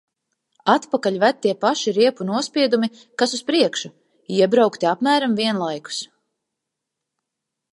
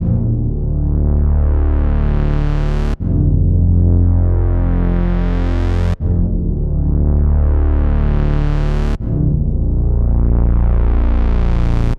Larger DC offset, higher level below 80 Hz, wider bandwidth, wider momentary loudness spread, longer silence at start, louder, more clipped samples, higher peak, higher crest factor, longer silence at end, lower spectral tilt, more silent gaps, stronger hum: neither; second, -76 dBFS vs -14 dBFS; first, 11.5 kHz vs 5.2 kHz; first, 9 LU vs 5 LU; first, 0.65 s vs 0 s; second, -20 LUFS vs -16 LUFS; neither; about the same, -2 dBFS vs -2 dBFS; first, 20 dB vs 10 dB; first, 1.65 s vs 0 s; second, -4 dB/octave vs -10 dB/octave; neither; neither